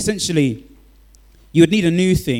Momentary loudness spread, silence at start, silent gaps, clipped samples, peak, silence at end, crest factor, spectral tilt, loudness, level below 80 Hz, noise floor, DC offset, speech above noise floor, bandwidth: 8 LU; 0 s; none; under 0.1%; 0 dBFS; 0 s; 18 dB; -5.5 dB/octave; -16 LUFS; -40 dBFS; -48 dBFS; under 0.1%; 32 dB; 16.5 kHz